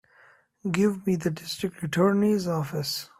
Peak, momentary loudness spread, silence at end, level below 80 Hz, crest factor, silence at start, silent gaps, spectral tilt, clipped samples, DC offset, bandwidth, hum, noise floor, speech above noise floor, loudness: -10 dBFS; 9 LU; 0.15 s; -62 dBFS; 18 dB; 0.65 s; none; -6 dB/octave; under 0.1%; under 0.1%; 15.5 kHz; none; -58 dBFS; 33 dB; -26 LUFS